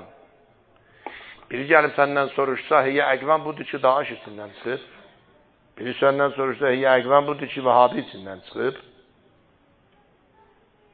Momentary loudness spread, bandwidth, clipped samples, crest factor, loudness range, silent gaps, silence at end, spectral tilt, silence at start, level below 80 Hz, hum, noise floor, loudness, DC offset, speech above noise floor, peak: 20 LU; 4.7 kHz; under 0.1%; 24 dB; 4 LU; none; 2.1 s; -9.5 dB/octave; 0 s; -68 dBFS; none; -60 dBFS; -21 LUFS; under 0.1%; 38 dB; 0 dBFS